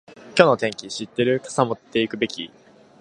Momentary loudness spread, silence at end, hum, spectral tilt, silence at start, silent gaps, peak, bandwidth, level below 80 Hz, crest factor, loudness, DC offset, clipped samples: 13 LU; 0.55 s; none; -4.5 dB/octave; 0.1 s; none; 0 dBFS; 11 kHz; -62 dBFS; 22 dB; -22 LUFS; under 0.1%; under 0.1%